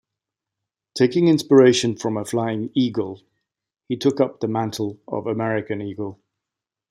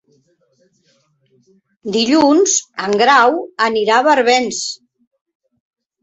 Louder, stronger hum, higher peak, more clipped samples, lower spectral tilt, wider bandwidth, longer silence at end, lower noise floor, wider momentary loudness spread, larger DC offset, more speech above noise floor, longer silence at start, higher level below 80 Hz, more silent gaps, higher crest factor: second, -21 LUFS vs -14 LUFS; neither; second, -4 dBFS vs 0 dBFS; neither; first, -5.5 dB/octave vs -2 dB/octave; first, 15.5 kHz vs 8.4 kHz; second, 0.75 s vs 1.25 s; first, -86 dBFS vs -58 dBFS; first, 16 LU vs 11 LU; neither; first, 66 dB vs 43 dB; second, 0.95 s vs 1.85 s; about the same, -66 dBFS vs -62 dBFS; neither; about the same, 18 dB vs 16 dB